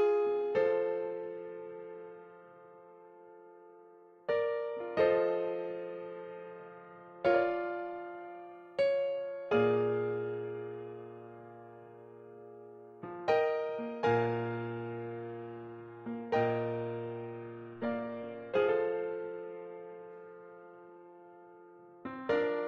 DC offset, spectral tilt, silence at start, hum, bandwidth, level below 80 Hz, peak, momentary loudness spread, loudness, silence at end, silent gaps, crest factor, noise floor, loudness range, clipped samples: under 0.1%; -8 dB/octave; 0 s; none; 6.6 kHz; -74 dBFS; -16 dBFS; 24 LU; -34 LUFS; 0 s; none; 20 dB; -58 dBFS; 7 LU; under 0.1%